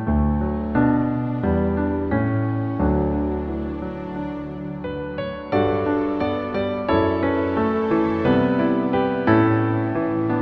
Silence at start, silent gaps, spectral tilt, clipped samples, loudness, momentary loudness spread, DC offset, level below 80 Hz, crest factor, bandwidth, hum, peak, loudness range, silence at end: 0 s; none; -10 dB/octave; under 0.1%; -22 LUFS; 10 LU; under 0.1%; -34 dBFS; 18 dB; 5.8 kHz; none; -2 dBFS; 5 LU; 0 s